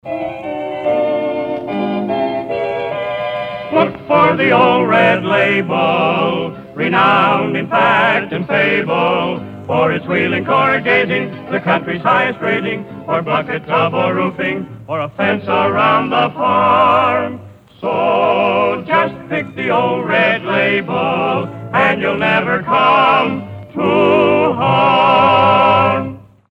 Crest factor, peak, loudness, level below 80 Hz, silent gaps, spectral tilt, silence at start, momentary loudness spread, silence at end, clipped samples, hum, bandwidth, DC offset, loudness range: 14 dB; 0 dBFS; -14 LUFS; -54 dBFS; none; -7.5 dB/octave; 0.05 s; 10 LU; 0.3 s; under 0.1%; none; 8.8 kHz; under 0.1%; 4 LU